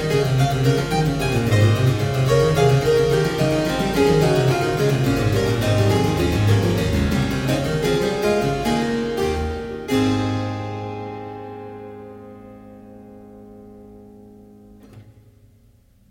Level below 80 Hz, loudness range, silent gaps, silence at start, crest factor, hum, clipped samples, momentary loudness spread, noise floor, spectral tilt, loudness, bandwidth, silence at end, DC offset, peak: -36 dBFS; 15 LU; none; 0 s; 16 dB; none; under 0.1%; 15 LU; -54 dBFS; -6.5 dB/octave; -19 LUFS; 16.5 kHz; 1.05 s; under 0.1%; -4 dBFS